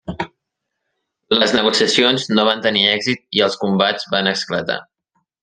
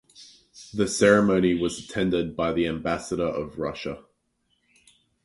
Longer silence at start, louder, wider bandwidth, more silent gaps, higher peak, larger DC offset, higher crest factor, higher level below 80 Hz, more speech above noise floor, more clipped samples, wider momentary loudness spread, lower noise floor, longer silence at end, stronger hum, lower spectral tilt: second, 0.05 s vs 0.2 s; first, -16 LUFS vs -24 LUFS; second, 10 kHz vs 11.5 kHz; neither; first, 0 dBFS vs -4 dBFS; neither; about the same, 18 dB vs 22 dB; about the same, -56 dBFS vs -52 dBFS; first, 61 dB vs 48 dB; neither; second, 11 LU vs 14 LU; first, -78 dBFS vs -72 dBFS; second, 0.6 s vs 1.25 s; neither; second, -3.5 dB/octave vs -5 dB/octave